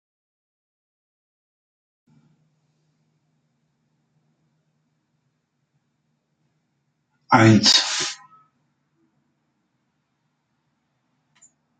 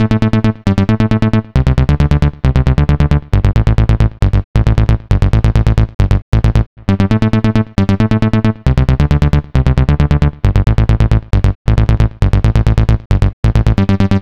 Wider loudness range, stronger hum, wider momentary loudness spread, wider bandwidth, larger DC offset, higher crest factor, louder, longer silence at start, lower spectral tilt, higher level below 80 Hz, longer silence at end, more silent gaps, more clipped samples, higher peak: first, 6 LU vs 1 LU; neither; first, 15 LU vs 2 LU; first, 10 kHz vs 8.4 kHz; neither; first, 26 dB vs 10 dB; second, -16 LUFS vs -13 LUFS; first, 7.3 s vs 0 s; second, -4 dB/octave vs -8.5 dB/octave; second, -64 dBFS vs -16 dBFS; first, 3.65 s vs 0 s; second, none vs 4.44-4.54 s, 5.95-5.99 s, 6.22-6.32 s, 6.66-6.76 s, 11.55-11.65 s, 13.06-13.10 s, 13.33-13.43 s; neither; about the same, 0 dBFS vs 0 dBFS